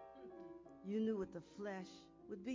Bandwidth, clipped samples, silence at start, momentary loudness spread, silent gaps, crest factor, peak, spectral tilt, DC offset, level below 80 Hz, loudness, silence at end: 7.6 kHz; under 0.1%; 0 s; 16 LU; none; 16 dB; -32 dBFS; -7 dB/octave; under 0.1%; -76 dBFS; -47 LUFS; 0 s